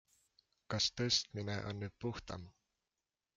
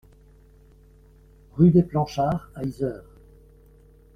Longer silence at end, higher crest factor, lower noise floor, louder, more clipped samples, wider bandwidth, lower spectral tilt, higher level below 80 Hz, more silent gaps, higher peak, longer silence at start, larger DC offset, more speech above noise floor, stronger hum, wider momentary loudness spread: second, 0.85 s vs 1.2 s; about the same, 22 dB vs 20 dB; first, under -90 dBFS vs -53 dBFS; second, -38 LUFS vs -23 LUFS; neither; first, 9.4 kHz vs 6.6 kHz; second, -3.5 dB/octave vs -9 dB/octave; second, -66 dBFS vs -50 dBFS; neither; second, -20 dBFS vs -6 dBFS; second, 0.7 s vs 1.55 s; neither; first, over 51 dB vs 31 dB; neither; second, 14 LU vs 17 LU